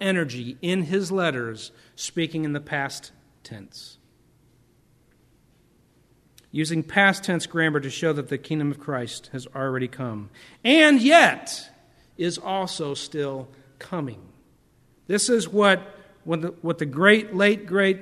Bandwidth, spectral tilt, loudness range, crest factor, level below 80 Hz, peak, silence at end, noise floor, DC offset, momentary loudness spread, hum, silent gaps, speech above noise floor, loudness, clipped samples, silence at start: 13.5 kHz; -4.5 dB/octave; 12 LU; 24 dB; -66 dBFS; 0 dBFS; 0 s; -60 dBFS; under 0.1%; 18 LU; none; none; 37 dB; -22 LUFS; under 0.1%; 0 s